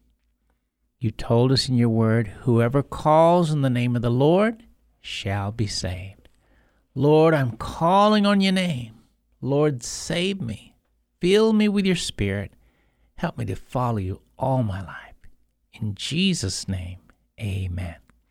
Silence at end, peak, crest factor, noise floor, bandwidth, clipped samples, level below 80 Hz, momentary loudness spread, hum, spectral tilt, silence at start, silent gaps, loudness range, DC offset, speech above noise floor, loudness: 0.35 s; -6 dBFS; 16 dB; -71 dBFS; 14 kHz; under 0.1%; -46 dBFS; 16 LU; none; -6 dB/octave; 1 s; none; 8 LU; under 0.1%; 50 dB; -22 LUFS